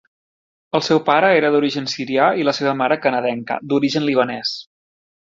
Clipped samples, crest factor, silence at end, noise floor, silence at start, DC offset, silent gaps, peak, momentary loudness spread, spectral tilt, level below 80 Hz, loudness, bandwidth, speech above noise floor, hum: under 0.1%; 18 dB; 0.75 s; under -90 dBFS; 0.75 s; under 0.1%; none; -2 dBFS; 9 LU; -5 dB/octave; -64 dBFS; -18 LUFS; 7.6 kHz; over 72 dB; none